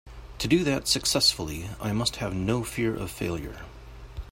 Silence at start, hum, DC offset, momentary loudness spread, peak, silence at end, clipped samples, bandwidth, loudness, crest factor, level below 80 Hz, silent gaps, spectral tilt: 0.05 s; none; under 0.1%; 22 LU; -8 dBFS; 0 s; under 0.1%; 16.5 kHz; -26 LUFS; 20 dB; -44 dBFS; none; -4 dB/octave